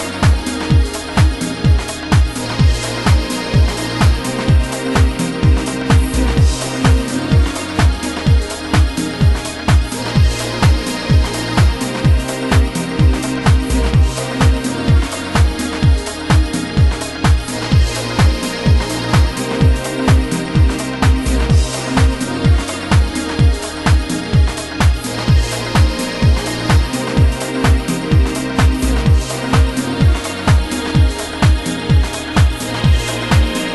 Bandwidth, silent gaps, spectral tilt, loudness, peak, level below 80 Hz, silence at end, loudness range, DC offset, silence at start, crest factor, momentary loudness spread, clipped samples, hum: 12.5 kHz; none; -5.5 dB/octave; -15 LUFS; 0 dBFS; -18 dBFS; 0 s; 1 LU; under 0.1%; 0 s; 14 dB; 3 LU; under 0.1%; none